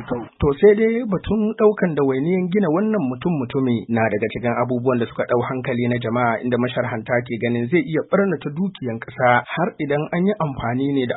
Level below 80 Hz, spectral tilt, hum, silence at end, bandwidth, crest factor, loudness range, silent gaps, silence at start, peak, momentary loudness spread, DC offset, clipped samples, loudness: -46 dBFS; -12.5 dB/octave; none; 0 s; 4.1 kHz; 18 dB; 3 LU; none; 0 s; -2 dBFS; 6 LU; under 0.1%; under 0.1%; -20 LUFS